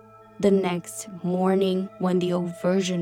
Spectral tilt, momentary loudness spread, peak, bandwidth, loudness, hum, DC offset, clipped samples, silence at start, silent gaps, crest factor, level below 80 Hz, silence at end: -6 dB/octave; 8 LU; -8 dBFS; 15 kHz; -24 LUFS; none; under 0.1%; under 0.1%; 0.4 s; none; 16 dB; -64 dBFS; 0 s